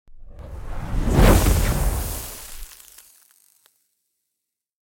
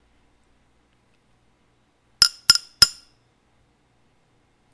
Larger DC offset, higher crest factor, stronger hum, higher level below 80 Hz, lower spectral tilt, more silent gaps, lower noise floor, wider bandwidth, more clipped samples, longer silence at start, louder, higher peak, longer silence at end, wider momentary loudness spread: neither; second, 20 dB vs 26 dB; neither; first, -26 dBFS vs -52 dBFS; first, -5.5 dB/octave vs 1 dB/octave; neither; first, -82 dBFS vs -64 dBFS; first, 17 kHz vs 11 kHz; neither; second, 0.1 s vs 2.2 s; second, -21 LUFS vs -17 LUFS; about the same, -2 dBFS vs 0 dBFS; first, 2.15 s vs 1.85 s; first, 24 LU vs 3 LU